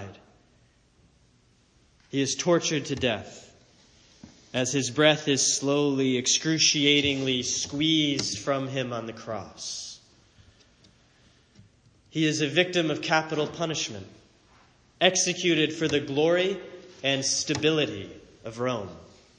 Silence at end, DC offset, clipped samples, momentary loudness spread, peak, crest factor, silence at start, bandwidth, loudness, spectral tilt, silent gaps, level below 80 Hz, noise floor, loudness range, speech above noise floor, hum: 0.35 s; under 0.1%; under 0.1%; 15 LU; -4 dBFS; 24 dB; 0 s; 10.5 kHz; -25 LUFS; -3 dB/octave; none; -64 dBFS; -62 dBFS; 9 LU; 37 dB; none